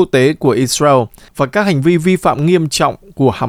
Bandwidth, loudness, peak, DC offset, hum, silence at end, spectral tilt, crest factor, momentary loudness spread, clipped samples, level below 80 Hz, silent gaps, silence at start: 16 kHz; -13 LUFS; 0 dBFS; under 0.1%; none; 0 s; -5.5 dB/octave; 12 dB; 5 LU; under 0.1%; -44 dBFS; none; 0 s